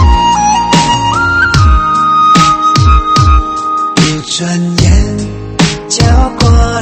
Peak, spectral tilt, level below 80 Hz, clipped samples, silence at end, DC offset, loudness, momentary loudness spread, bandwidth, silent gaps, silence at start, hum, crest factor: 0 dBFS; -4.5 dB/octave; -14 dBFS; 0.6%; 0 s; under 0.1%; -9 LUFS; 6 LU; 8.8 kHz; none; 0 s; none; 8 dB